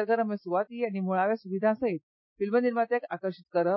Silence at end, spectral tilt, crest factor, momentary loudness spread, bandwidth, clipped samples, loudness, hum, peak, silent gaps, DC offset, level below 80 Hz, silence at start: 0 s; -11 dB/octave; 14 dB; 8 LU; 5.8 kHz; under 0.1%; -29 LUFS; none; -14 dBFS; 2.03-2.36 s; under 0.1%; -76 dBFS; 0 s